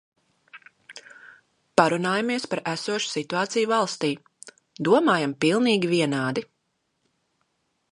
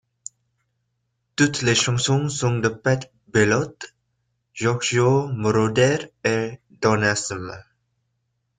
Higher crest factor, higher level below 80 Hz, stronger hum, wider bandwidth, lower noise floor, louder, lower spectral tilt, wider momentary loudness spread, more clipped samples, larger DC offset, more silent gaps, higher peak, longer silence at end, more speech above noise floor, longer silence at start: first, 24 dB vs 18 dB; second, -72 dBFS vs -56 dBFS; neither; first, 11.5 kHz vs 9.6 kHz; about the same, -75 dBFS vs -74 dBFS; about the same, -23 LUFS vs -21 LUFS; about the same, -4.5 dB/octave vs -4.5 dB/octave; second, 12 LU vs 19 LU; neither; neither; neither; about the same, -2 dBFS vs -4 dBFS; first, 1.45 s vs 1 s; about the same, 51 dB vs 53 dB; second, 0.55 s vs 1.4 s